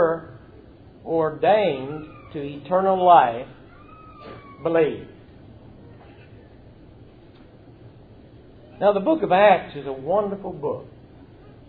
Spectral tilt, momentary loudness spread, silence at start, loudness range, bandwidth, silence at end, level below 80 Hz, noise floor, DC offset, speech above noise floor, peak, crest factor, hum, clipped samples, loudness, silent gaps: -10 dB/octave; 25 LU; 0 s; 9 LU; 4.7 kHz; 0.8 s; -54 dBFS; -48 dBFS; under 0.1%; 27 dB; -2 dBFS; 20 dB; none; under 0.1%; -21 LUFS; none